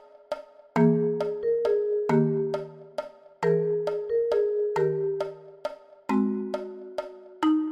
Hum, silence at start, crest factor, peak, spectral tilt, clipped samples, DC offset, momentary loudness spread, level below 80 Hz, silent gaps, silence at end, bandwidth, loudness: none; 0.3 s; 18 dB; -10 dBFS; -8.5 dB/octave; under 0.1%; under 0.1%; 14 LU; -66 dBFS; none; 0 s; 8.8 kHz; -27 LUFS